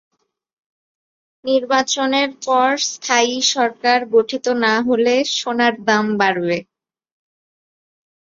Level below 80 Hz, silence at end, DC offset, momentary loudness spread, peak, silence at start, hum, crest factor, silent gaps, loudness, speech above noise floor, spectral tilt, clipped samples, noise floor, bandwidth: -66 dBFS; 1.75 s; under 0.1%; 5 LU; -2 dBFS; 1.45 s; none; 18 dB; none; -17 LUFS; over 73 dB; -2.5 dB/octave; under 0.1%; under -90 dBFS; 7.6 kHz